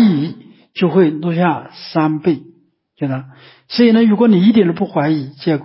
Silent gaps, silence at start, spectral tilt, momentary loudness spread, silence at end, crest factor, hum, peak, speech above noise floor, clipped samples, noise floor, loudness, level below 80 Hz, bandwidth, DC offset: none; 0 s; -11.5 dB/octave; 13 LU; 0 s; 12 dB; none; -2 dBFS; 21 dB; under 0.1%; -35 dBFS; -15 LUFS; -60 dBFS; 5.8 kHz; under 0.1%